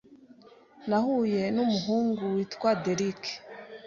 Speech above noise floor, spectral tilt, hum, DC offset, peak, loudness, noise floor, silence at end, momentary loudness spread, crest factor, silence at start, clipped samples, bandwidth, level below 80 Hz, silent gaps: 27 dB; -6 dB/octave; none; under 0.1%; -12 dBFS; -28 LUFS; -55 dBFS; 0 s; 11 LU; 16 dB; 0.1 s; under 0.1%; 7.4 kHz; -68 dBFS; none